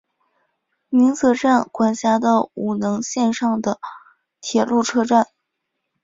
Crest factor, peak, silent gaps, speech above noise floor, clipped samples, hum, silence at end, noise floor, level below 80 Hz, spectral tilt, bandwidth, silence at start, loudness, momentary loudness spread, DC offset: 18 dB; -2 dBFS; none; 59 dB; under 0.1%; none; 0.8 s; -77 dBFS; -62 dBFS; -4.5 dB/octave; 7.8 kHz; 0.9 s; -19 LUFS; 9 LU; under 0.1%